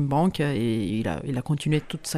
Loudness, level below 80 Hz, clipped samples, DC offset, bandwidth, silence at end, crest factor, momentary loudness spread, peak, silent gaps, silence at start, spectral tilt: -26 LUFS; -48 dBFS; under 0.1%; under 0.1%; 14.5 kHz; 0 s; 14 dB; 5 LU; -12 dBFS; none; 0 s; -6 dB/octave